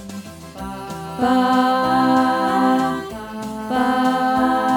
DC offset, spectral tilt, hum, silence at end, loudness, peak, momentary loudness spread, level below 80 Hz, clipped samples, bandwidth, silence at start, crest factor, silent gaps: under 0.1%; -5.5 dB/octave; none; 0 s; -18 LUFS; -4 dBFS; 15 LU; -50 dBFS; under 0.1%; 18 kHz; 0 s; 14 dB; none